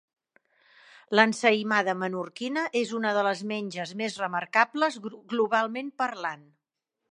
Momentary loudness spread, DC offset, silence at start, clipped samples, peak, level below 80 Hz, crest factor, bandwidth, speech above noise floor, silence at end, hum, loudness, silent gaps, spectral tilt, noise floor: 11 LU; under 0.1%; 1.1 s; under 0.1%; -2 dBFS; -82 dBFS; 26 dB; 11 kHz; 57 dB; 0.7 s; none; -27 LUFS; none; -4 dB/octave; -84 dBFS